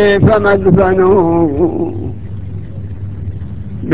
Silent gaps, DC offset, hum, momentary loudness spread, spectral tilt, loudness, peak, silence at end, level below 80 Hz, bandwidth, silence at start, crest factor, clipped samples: none; 3%; none; 16 LU; -12 dB/octave; -11 LUFS; 0 dBFS; 0 s; -30 dBFS; 4 kHz; 0 s; 12 dB; 0.1%